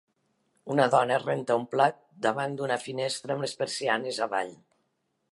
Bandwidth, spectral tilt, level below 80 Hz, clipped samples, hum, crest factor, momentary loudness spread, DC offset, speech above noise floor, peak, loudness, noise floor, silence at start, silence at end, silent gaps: 11.5 kHz; -4.5 dB/octave; -80 dBFS; under 0.1%; none; 22 dB; 8 LU; under 0.1%; 49 dB; -8 dBFS; -28 LUFS; -77 dBFS; 0.65 s; 0.8 s; none